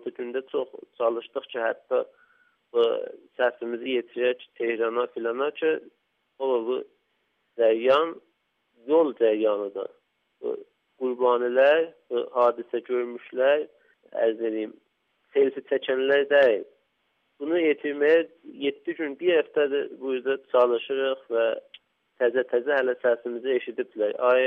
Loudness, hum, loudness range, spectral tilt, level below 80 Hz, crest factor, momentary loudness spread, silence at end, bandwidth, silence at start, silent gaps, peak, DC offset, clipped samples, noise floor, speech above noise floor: -25 LUFS; none; 4 LU; -6 dB/octave; -82 dBFS; 16 dB; 12 LU; 0 s; 5 kHz; 0.05 s; none; -10 dBFS; under 0.1%; under 0.1%; -73 dBFS; 48 dB